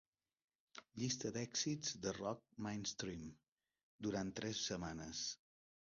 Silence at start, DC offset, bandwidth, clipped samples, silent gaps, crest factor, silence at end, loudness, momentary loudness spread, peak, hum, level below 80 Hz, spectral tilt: 0.75 s; under 0.1%; 7.2 kHz; under 0.1%; 3.48-3.57 s, 3.83-3.99 s; 18 dB; 0.55 s; -44 LUFS; 13 LU; -28 dBFS; none; -70 dBFS; -4 dB/octave